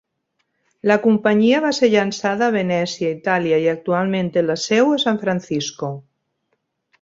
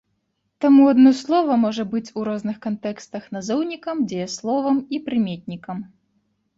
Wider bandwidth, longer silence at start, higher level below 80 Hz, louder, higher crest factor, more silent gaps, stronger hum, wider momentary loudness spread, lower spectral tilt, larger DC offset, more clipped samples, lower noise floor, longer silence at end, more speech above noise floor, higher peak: about the same, 7.8 kHz vs 7.8 kHz; first, 0.85 s vs 0.6 s; about the same, -62 dBFS vs -64 dBFS; about the same, -18 LUFS vs -20 LUFS; about the same, 18 dB vs 16 dB; neither; neither; second, 8 LU vs 18 LU; about the same, -5 dB/octave vs -6 dB/octave; neither; neither; about the same, -72 dBFS vs -72 dBFS; first, 1 s vs 0.7 s; about the same, 54 dB vs 52 dB; about the same, -2 dBFS vs -4 dBFS